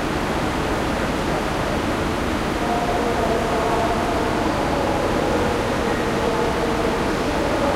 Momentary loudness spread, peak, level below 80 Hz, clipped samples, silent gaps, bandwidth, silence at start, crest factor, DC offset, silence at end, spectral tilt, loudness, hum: 2 LU; -8 dBFS; -32 dBFS; under 0.1%; none; 16 kHz; 0 s; 12 dB; under 0.1%; 0 s; -5 dB/octave; -21 LUFS; none